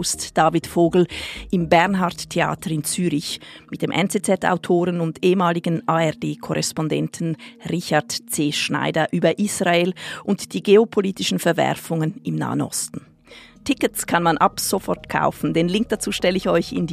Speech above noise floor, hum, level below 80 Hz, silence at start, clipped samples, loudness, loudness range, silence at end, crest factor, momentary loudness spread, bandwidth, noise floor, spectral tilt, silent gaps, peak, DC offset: 25 dB; none; -50 dBFS; 0 s; under 0.1%; -21 LUFS; 3 LU; 0 s; 18 dB; 8 LU; 15.5 kHz; -46 dBFS; -4.5 dB/octave; none; -2 dBFS; under 0.1%